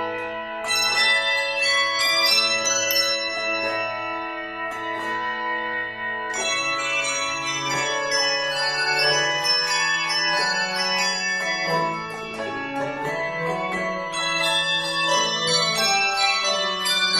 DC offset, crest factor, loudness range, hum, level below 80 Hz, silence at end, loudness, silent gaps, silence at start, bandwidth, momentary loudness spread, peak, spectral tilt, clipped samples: under 0.1%; 16 dB; 6 LU; none; -60 dBFS; 0 s; -21 LUFS; none; 0 s; 16 kHz; 10 LU; -6 dBFS; -1 dB/octave; under 0.1%